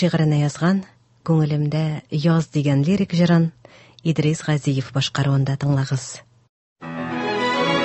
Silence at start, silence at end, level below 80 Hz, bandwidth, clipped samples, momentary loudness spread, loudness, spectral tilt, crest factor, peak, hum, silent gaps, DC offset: 0 s; 0 s; -54 dBFS; 8.6 kHz; under 0.1%; 9 LU; -21 LUFS; -6.5 dB/octave; 14 dB; -6 dBFS; none; 6.49-6.76 s; under 0.1%